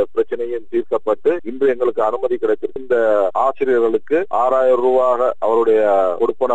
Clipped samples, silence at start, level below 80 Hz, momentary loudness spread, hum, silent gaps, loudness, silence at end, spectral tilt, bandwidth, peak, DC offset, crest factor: under 0.1%; 0 s; -62 dBFS; 7 LU; none; none; -17 LUFS; 0 s; -6.5 dB/octave; 8 kHz; -4 dBFS; 3%; 12 dB